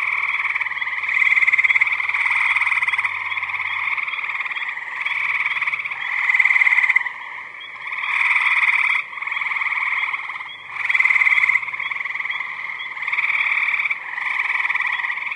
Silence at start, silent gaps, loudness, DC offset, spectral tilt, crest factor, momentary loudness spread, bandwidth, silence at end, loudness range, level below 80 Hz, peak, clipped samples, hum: 0 s; none; -18 LUFS; under 0.1%; 0.5 dB/octave; 18 dB; 12 LU; 11 kHz; 0 s; 4 LU; -78 dBFS; -2 dBFS; under 0.1%; none